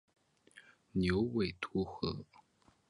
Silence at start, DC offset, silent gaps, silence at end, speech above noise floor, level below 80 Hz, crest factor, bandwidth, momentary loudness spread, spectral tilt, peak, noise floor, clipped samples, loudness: 0.55 s; under 0.1%; none; 0.65 s; 33 dB; -56 dBFS; 20 dB; 11 kHz; 8 LU; -7.5 dB/octave; -20 dBFS; -69 dBFS; under 0.1%; -36 LUFS